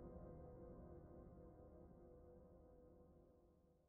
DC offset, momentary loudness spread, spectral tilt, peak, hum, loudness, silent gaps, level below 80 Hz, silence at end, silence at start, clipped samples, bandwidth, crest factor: under 0.1%; 9 LU; -9 dB/octave; -44 dBFS; none; -63 LUFS; none; -68 dBFS; 0 s; 0 s; under 0.1%; 2.1 kHz; 18 dB